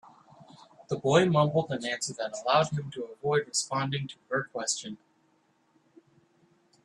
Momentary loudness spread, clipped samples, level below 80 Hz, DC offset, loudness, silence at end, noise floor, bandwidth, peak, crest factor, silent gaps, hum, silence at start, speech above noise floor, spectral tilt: 11 LU; under 0.1%; -70 dBFS; under 0.1%; -29 LUFS; 1.9 s; -69 dBFS; 12 kHz; -10 dBFS; 22 dB; none; none; 0.4 s; 40 dB; -4.5 dB/octave